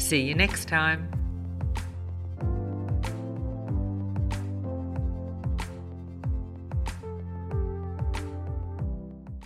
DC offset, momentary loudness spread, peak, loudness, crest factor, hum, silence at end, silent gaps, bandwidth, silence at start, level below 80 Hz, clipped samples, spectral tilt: under 0.1%; 12 LU; -8 dBFS; -31 LUFS; 22 dB; none; 0 s; none; 15 kHz; 0 s; -36 dBFS; under 0.1%; -5 dB/octave